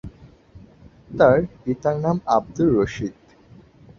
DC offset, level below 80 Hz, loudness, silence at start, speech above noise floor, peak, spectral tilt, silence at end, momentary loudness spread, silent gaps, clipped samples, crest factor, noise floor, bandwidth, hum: under 0.1%; -48 dBFS; -21 LUFS; 0.05 s; 30 dB; -2 dBFS; -8 dB/octave; 0.9 s; 15 LU; none; under 0.1%; 20 dB; -49 dBFS; 7.4 kHz; none